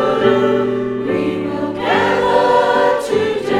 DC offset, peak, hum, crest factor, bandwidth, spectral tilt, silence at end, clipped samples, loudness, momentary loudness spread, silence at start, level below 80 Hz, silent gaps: under 0.1%; 0 dBFS; none; 14 dB; 13.5 kHz; -5.5 dB/octave; 0 s; under 0.1%; -15 LUFS; 7 LU; 0 s; -48 dBFS; none